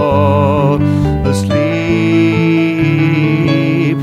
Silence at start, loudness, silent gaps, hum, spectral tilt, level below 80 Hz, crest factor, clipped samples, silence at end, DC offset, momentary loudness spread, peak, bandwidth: 0 s; -12 LUFS; none; none; -7.5 dB/octave; -32 dBFS; 12 dB; under 0.1%; 0 s; under 0.1%; 3 LU; 0 dBFS; 13 kHz